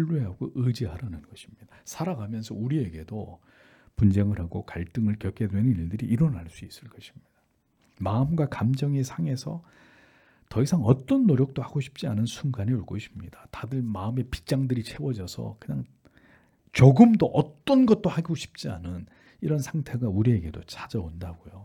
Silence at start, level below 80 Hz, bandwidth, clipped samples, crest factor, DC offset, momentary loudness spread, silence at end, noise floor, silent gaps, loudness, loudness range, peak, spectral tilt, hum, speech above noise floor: 0 s; -52 dBFS; 14.5 kHz; under 0.1%; 24 dB; under 0.1%; 17 LU; 0 s; -69 dBFS; none; -26 LUFS; 9 LU; -2 dBFS; -8 dB/octave; none; 43 dB